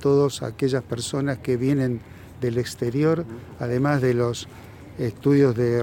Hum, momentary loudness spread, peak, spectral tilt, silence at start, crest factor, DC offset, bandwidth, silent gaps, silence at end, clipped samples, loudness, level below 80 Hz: none; 13 LU; -8 dBFS; -6.5 dB/octave; 0 s; 16 dB; under 0.1%; 17 kHz; none; 0 s; under 0.1%; -23 LUFS; -52 dBFS